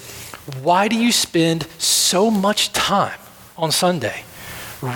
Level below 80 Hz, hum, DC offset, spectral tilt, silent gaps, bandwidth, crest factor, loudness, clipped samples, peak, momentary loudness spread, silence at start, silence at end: -54 dBFS; none; under 0.1%; -3 dB/octave; none; 19.5 kHz; 16 dB; -17 LUFS; under 0.1%; -4 dBFS; 17 LU; 0 s; 0 s